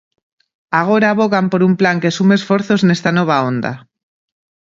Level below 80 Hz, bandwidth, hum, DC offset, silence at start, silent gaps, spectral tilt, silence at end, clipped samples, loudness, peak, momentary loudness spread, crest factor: -58 dBFS; 7.6 kHz; none; under 0.1%; 0.7 s; none; -6.5 dB/octave; 0.9 s; under 0.1%; -14 LUFS; 0 dBFS; 6 LU; 16 dB